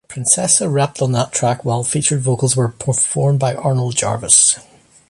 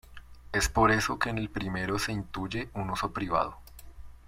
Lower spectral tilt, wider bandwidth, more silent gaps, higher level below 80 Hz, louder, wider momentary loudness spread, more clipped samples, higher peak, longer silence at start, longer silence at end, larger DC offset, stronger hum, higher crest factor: about the same, -4 dB/octave vs -4.5 dB/octave; second, 11.5 kHz vs 16.5 kHz; neither; second, -50 dBFS vs -44 dBFS; first, -15 LUFS vs -30 LUFS; second, 8 LU vs 11 LU; neither; first, 0 dBFS vs -10 dBFS; about the same, 0.1 s vs 0.05 s; first, 0.5 s vs 0.1 s; neither; neither; about the same, 16 dB vs 20 dB